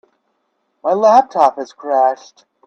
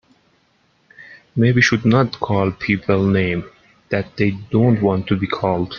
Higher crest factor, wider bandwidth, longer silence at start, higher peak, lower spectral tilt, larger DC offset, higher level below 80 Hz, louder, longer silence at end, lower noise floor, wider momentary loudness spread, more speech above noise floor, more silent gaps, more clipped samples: about the same, 16 dB vs 16 dB; first, 8.2 kHz vs 7 kHz; second, 0.85 s vs 1 s; about the same, 0 dBFS vs -2 dBFS; second, -5 dB/octave vs -7 dB/octave; neither; second, -70 dBFS vs -50 dBFS; first, -14 LUFS vs -18 LUFS; first, 0.55 s vs 0 s; first, -67 dBFS vs -60 dBFS; first, 15 LU vs 10 LU; first, 53 dB vs 43 dB; neither; neither